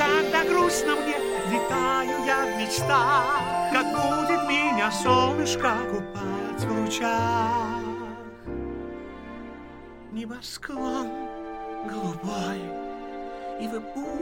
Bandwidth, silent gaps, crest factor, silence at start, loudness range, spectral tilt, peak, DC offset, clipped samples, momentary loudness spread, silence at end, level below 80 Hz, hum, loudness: 17 kHz; none; 18 dB; 0 s; 12 LU; -4 dB/octave; -8 dBFS; under 0.1%; under 0.1%; 15 LU; 0 s; -50 dBFS; none; -25 LUFS